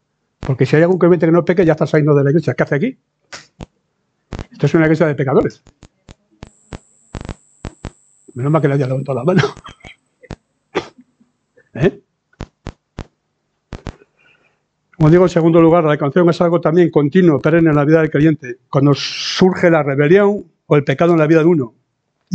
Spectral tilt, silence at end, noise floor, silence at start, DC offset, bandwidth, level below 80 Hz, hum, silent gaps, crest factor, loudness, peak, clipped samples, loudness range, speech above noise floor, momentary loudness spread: -7.5 dB/octave; 0 s; -69 dBFS; 0.4 s; under 0.1%; 8.4 kHz; -44 dBFS; none; none; 16 dB; -14 LUFS; 0 dBFS; under 0.1%; 13 LU; 56 dB; 22 LU